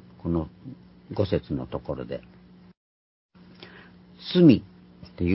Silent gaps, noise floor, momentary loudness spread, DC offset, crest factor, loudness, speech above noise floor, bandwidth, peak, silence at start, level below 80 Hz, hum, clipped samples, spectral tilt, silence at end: 2.77-3.29 s; -50 dBFS; 27 LU; under 0.1%; 22 dB; -25 LUFS; 26 dB; 5.8 kHz; -4 dBFS; 0.25 s; -46 dBFS; none; under 0.1%; -11.5 dB/octave; 0 s